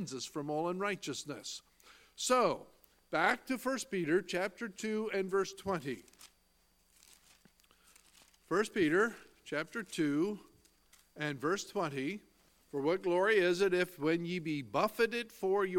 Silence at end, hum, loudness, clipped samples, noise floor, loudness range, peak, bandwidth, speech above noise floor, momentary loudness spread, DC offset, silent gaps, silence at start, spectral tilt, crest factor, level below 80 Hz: 0 s; none; -34 LUFS; under 0.1%; -72 dBFS; 7 LU; -14 dBFS; 17.5 kHz; 38 dB; 11 LU; under 0.1%; none; 0 s; -4.5 dB/octave; 22 dB; -72 dBFS